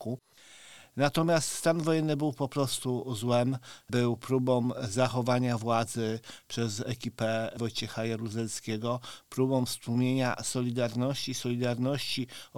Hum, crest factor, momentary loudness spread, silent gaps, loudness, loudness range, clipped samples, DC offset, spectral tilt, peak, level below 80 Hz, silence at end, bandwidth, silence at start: none; 20 dB; 7 LU; none; -30 LUFS; 3 LU; under 0.1%; 0.2%; -5 dB/octave; -10 dBFS; -64 dBFS; 0 s; 18 kHz; 0 s